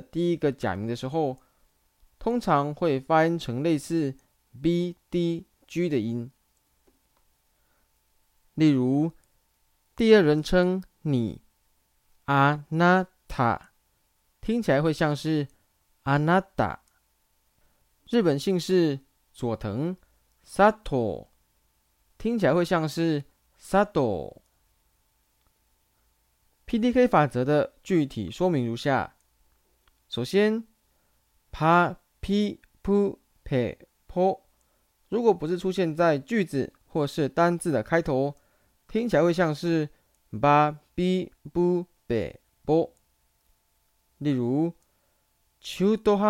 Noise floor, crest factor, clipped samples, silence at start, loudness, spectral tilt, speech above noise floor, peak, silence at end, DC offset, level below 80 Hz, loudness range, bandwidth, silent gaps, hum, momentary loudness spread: -69 dBFS; 22 dB; under 0.1%; 0.15 s; -26 LUFS; -7 dB/octave; 45 dB; -4 dBFS; 0 s; under 0.1%; -52 dBFS; 5 LU; 16 kHz; none; none; 13 LU